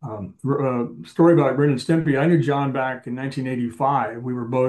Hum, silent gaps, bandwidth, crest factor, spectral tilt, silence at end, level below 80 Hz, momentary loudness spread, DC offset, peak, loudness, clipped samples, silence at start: none; none; 10.5 kHz; 16 dB; -8 dB/octave; 0 s; -62 dBFS; 12 LU; under 0.1%; -4 dBFS; -21 LUFS; under 0.1%; 0 s